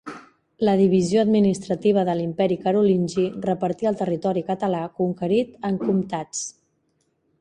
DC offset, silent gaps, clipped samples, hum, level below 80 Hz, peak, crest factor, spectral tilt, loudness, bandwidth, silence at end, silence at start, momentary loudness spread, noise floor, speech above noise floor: under 0.1%; none; under 0.1%; none; -60 dBFS; -6 dBFS; 16 dB; -6.5 dB/octave; -22 LUFS; 10.5 kHz; 0.9 s; 0.05 s; 9 LU; -69 dBFS; 48 dB